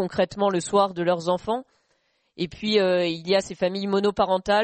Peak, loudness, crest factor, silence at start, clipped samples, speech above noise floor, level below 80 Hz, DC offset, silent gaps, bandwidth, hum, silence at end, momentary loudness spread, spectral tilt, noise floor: -8 dBFS; -24 LUFS; 16 dB; 0 s; under 0.1%; 46 dB; -56 dBFS; under 0.1%; none; 8.8 kHz; none; 0 s; 8 LU; -5 dB/octave; -69 dBFS